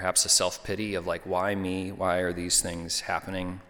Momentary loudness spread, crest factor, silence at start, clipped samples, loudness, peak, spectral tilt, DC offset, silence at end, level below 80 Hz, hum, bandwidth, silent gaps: 10 LU; 20 dB; 0 s; under 0.1%; -27 LUFS; -8 dBFS; -2.5 dB/octave; under 0.1%; 0.05 s; -52 dBFS; none; 19 kHz; none